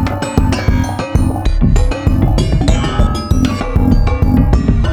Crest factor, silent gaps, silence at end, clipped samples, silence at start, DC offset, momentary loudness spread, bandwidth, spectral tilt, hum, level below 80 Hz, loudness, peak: 12 dB; none; 0 s; under 0.1%; 0 s; under 0.1%; 3 LU; 18 kHz; -7 dB/octave; none; -16 dBFS; -14 LUFS; 0 dBFS